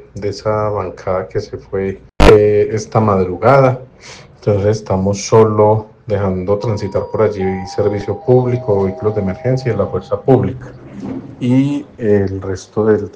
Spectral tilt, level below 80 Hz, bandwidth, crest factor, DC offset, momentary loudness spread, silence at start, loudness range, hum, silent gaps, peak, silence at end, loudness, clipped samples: -7 dB/octave; -30 dBFS; 11 kHz; 14 dB; under 0.1%; 13 LU; 0.15 s; 4 LU; none; none; 0 dBFS; 0.05 s; -15 LUFS; under 0.1%